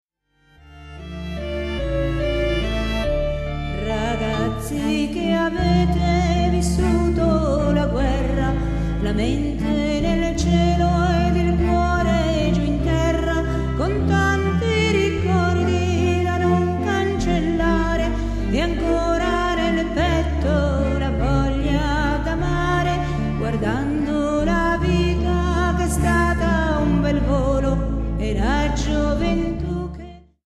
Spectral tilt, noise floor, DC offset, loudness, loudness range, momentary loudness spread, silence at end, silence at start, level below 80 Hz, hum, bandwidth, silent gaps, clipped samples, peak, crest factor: -6.5 dB/octave; -60 dBFS; under 0.1%; -20 LUFS; 3 LU; 5 LU; 0.25 s; 0.7 s; -26 dBFS; none; 13 kHz; none; under 0.1%; -6 dBFS; 14 dB